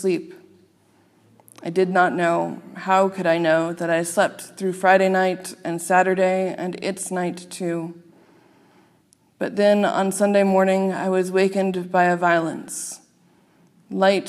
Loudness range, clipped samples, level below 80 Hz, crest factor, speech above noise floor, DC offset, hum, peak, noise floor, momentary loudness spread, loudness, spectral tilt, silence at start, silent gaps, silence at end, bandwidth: 5 LU; under 0.1%; -78 dBFS; 18 dB; 39 dB; under 0.1%; none; -4 dBFS; -59 dBFS; 12 LU; -21 LUFS; -5 dB/octave; 0 s; none; 0 s; 14.5 kHz